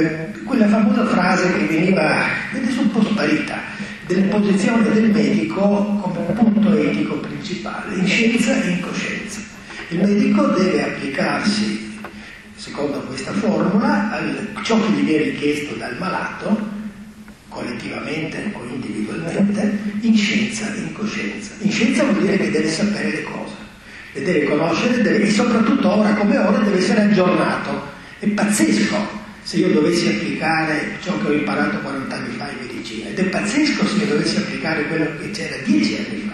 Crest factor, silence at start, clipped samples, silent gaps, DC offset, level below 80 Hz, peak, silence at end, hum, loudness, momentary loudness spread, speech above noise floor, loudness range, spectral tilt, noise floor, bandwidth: 16 dB; 0 s; under 0.1%; none; under 0.1%; -50 dBFS; -2 dBFS; 0 s; none; -19 LUFS; 12 LU; 21 dB; 5 LU; -5.5 dB/octave; -39 dBFS; 12 kHz